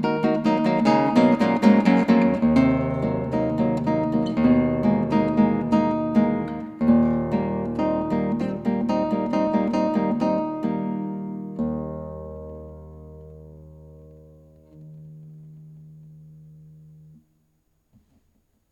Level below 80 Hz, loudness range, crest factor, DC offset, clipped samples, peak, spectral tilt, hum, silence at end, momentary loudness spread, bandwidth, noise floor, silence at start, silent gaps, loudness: -50 dBFS; 15 LU; 20 dB; under 0.1%; under 0.1%; -2 dBFS; -8.5 dB/octave; none; 2.3 s; 17 LU; 8 kHz; -68 dBFS; 0 s; none; -22 LUFS